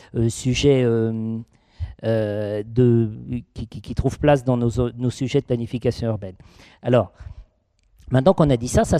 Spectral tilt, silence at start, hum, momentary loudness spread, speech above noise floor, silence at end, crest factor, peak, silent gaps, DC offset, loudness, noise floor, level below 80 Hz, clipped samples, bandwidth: -7 dB/octave; 0.15 s; none; 14 LU; 42 dB; 0 s; 18 dB; -4 dBFS; none; under 0.1%; -21 LUFS; -62 dBFS; -40 dBFS; under 0.1%; 13 kHz